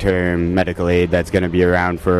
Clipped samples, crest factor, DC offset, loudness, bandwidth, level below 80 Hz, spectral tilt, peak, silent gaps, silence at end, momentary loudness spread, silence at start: under 0.1%; 14 dB; under 0.1%; -17 LUFS; 13 kHz; -34 dBFS; -7.5 dB/octave; -2 dBFS; none; 0 s; 3 LU; 0 s